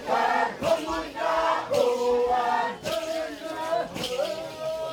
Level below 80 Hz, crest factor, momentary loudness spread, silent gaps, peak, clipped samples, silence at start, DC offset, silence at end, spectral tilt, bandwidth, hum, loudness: -56 dBFS; 18 dB; 8 LU; none; -10 dBFS; under 0.1%; 0 s; under 0.1%; 0 s; -3.5 dB/octave; 20 kHz; none; -26 LUFS